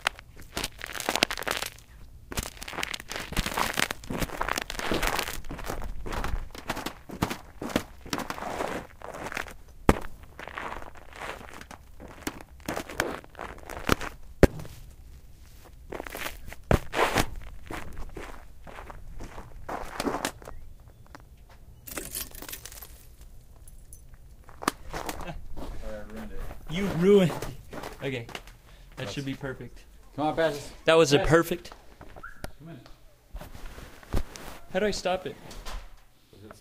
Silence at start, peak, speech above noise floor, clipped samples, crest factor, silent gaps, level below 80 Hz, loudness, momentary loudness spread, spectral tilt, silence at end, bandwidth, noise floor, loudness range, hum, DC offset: 0 s; 0 dBFS; 28 dB; under 0.1%; 32 dB; none; -42 dBFS; -30 LUFS; 22 LU; -4.5 dB/octave; 0 s; 16 kHz; -53 dBFS; 12 LU; none; under 0.1%